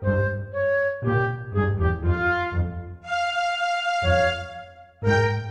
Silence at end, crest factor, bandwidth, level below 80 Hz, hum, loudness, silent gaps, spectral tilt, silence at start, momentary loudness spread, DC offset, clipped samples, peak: 0 s; 16 dB; 9.6 kHz; -38 dBFS; none; -24 LUFS; none; -6.5 dB/octave; 0 s; 8 LU; under 0.1%; under 0.1%; -8 dBFS